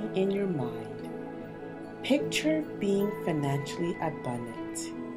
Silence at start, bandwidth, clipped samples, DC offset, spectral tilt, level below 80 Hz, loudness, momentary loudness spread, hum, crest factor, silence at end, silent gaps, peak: 0 s; 16 kHz; under 0.1%; under 0.1%; -5.5 dB/octave; -62 dBFS; -32 LUFS; 12 LU; none; 18 dB; 0 s; none; -14 dBFS